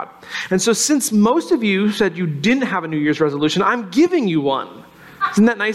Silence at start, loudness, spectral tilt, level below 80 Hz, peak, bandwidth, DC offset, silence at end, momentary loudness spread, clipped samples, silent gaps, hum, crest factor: 0 s; -17 LUFS; -4.5 dB/octave; -58 dBFS; -4 dBFS; 16 kHz; under 0.1%; 0 s; 6 LU; under 0.1%; none; none; 12 dB